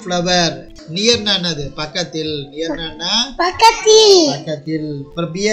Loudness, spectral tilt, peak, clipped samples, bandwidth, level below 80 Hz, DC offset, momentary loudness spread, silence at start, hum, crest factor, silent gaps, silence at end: -14 LUFS; -3 dB/octave; 0 dBFS; 0.2%; 16 kHz; -42 dBFS; under 0.1%; 15 LU; 0 s; none; 16 dB; none; 0 s